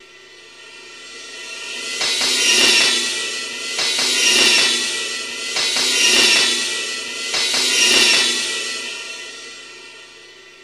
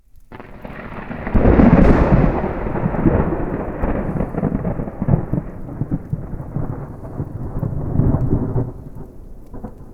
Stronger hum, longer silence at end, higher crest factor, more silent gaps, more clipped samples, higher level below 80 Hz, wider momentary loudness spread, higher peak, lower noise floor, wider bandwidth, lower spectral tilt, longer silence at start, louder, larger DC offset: neither; about the same, 0 s vs 0 s; about the same, 18 dB vs 18 dB; neither; neither; second, -62 dBFS vs -24 dBFS; second, 20 LU vs 23 LU; about the same, -2 dBFS vs 0 dBFS; first, -43 dBFS vs -38 dBFS; first, 16 kHz vs 5.8 kHz; second, 1.5 dB/octave vs -10.5 dB/octave; second, 0.15 s vs 0.3 s; first, -15 LUFS vs -19 LUFS; neither